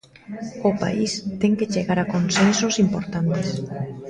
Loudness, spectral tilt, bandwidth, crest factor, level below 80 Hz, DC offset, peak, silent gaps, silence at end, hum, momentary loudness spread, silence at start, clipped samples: -22 LUFS; -5 dB/octave; 10 kHz; 18 dB; -52 dBFS; under 0.1%; -4 dBFS; none; 0 s; none; 11 LU; 0.3 s; under 0.1%